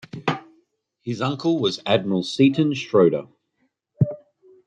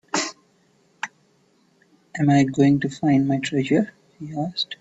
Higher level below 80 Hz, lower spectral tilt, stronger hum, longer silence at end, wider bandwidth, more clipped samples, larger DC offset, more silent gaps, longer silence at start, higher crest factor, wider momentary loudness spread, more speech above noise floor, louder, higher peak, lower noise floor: about the same, -66 dBFS vs -62 dBFS; about the same, -6.5 dB/octave vs -5.5 dB/octave; neither; first, 0.5 s vs 0.05 s; first, 9.6 kHz vs 8.2 kHz; neither; neither; neither; about the same, 0.15 s vs 0.15 s; about the same, 18 dB vs 18 dB; second, 13 LU vs 16 LU; first, 51 dB vs 41 dB; about the same, -22 LUFS vs -21 LUFS; about the same, -4 dBFS vs -6 dBFS; first, -71 dBFS vs -61 dBFS